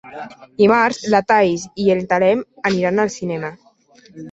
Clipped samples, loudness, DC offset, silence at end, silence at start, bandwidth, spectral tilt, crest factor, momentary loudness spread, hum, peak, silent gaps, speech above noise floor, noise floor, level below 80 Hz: under 0.1%; -17 LUFS; under 0.1%; 0 s; 0.05 s; 8.2 kHz; -5.5 dB/octave; 16 dB; 18 LU; none; -2 dBFS; none; 33 dB; -50 dBFS; -58 dBFS